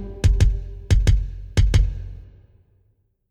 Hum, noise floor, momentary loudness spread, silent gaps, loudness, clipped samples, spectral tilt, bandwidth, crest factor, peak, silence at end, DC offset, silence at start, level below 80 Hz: none; -64 dBFS; 13 LU; none; -21 LUFS; under 0.1%; -6 dB/octave; 11 kHz; 16 dB; -4 dBFS; 1.1 s; under 0.1%; 0 s; -22 dBFS